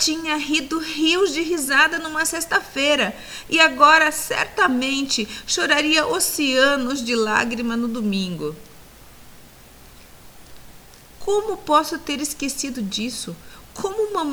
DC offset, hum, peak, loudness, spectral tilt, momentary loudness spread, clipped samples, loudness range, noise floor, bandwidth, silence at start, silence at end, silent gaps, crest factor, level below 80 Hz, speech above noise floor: under 0.1%; none; 0 dBFS; -19 LUFS; -2 dB/octave; 11 LU; under 0.1%; 12 LU; -45 dBFS; over 20 kHz; 0 s; 0 s; none; 20 dB; -50 dBFS; 25 dB